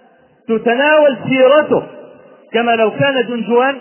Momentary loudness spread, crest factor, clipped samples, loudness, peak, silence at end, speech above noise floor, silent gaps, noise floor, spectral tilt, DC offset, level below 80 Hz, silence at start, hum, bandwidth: 8 LU; 14 dB; under 0.1%; -13 LUFS; 0 dBFS; 0 s; 28 dB; none; -40 dBFS; -9 dB/octave; under 0.1%; -60 dBFS; 0.5 s; none; 3.2 kHz